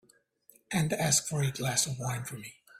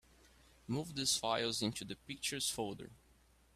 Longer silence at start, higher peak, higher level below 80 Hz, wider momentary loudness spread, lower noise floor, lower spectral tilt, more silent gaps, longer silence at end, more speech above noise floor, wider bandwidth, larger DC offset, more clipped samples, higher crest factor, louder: about the same, 0.7 s vs 0.7 s; first, -12 dBFS vs -20 dBFS; about the same, -64 dBFS vs -68 dBFS; second, 12 LU vs 15 LU; second, -64 dBFS vs -68 dBFS; about the same, -3.5 dB/octave vs -2.5 dB/octave; neither; second, 0 s vs 0.6 s; first, 33 dB vs 29 dB; about the same, 16 kHz vs 15.5 kHz; neither; neither; about the same, 20 dB vs 20 dB; first, -29 LUFS vs -38 LUFS